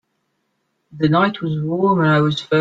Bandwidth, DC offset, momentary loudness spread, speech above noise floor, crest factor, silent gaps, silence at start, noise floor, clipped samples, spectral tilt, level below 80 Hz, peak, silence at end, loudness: 7.8 kHz; under 0.1%; 7 LU; 54 dB; 14 dB; none; 0.95 s; -70 dBFS; under 0.1%; -7.5 dB/octave; -56 dBFS; -4 dBFS; 0 s; -17 LUFS